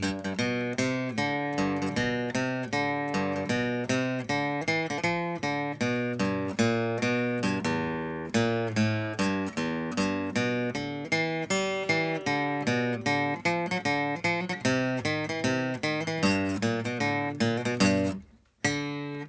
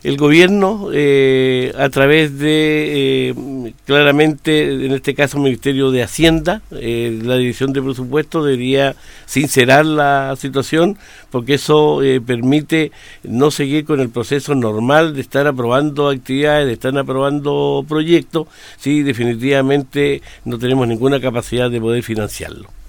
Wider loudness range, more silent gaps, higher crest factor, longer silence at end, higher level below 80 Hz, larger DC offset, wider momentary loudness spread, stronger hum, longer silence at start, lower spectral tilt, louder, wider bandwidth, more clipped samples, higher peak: about the same, 1 LU vs 3 LU; neither; about the same, 18 dB vs 14 dB; about the same, 0 s vs 0 s; second, -56 dBFS vs -40 dBFS; neither; second, 3 LU vs 10 LU; neither; about the same, 0 s vs 0.05 s; about the same, -5 dB/octave vs -5.5 dB/octave; second, -28 LUFS vs -15 LUFS; second, 8 kHz vs 19 kHz; neither; second, -10 dBFS vs 0 dBFS